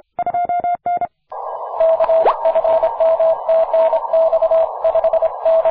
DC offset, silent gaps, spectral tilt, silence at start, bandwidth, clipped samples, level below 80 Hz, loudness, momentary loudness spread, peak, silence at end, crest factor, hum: under 0.1%; none; -7.5 dB/octave; 0.2 s; 4.6 kHz; under 0.1%; -52 dBFS; -16 LUFS; 8 LU; -4 dBFS; 0 s; 12 dB; none